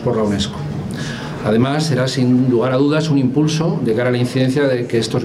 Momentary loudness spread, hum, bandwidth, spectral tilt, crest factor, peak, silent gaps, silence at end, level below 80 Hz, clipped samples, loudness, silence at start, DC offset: 9 LU; none; 13.5 kHz; -6.5 dB/octave; 12 dB; -4 dBFS; none; 0 s; -48 dBFS; under 0.1%; -17 LUFS; 0 s; under 0.1%